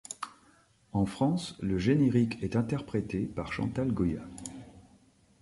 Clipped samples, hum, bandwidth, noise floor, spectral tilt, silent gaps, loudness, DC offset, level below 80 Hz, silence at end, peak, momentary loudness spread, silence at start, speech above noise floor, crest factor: under 0.1%; none; 11.5 kHz; -63 dBFS; -7 dB/octave; none; -31 LUFS; under 0.1%; -52 dBFS; 0.6 s; -14 dBFS; 17 LU; 0.1 s; 34 dB; 18 dB